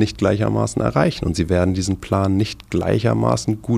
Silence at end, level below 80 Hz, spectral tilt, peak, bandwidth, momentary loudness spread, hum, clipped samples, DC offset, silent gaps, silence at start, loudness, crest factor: 0 s; -38 dBFS; -6.5 dB/octave; -4 dBFS; 13.5 kHz; 4 LU; none; under 0.1%; under 0.1%; none; 0 s; -19 LUFS; 14 dB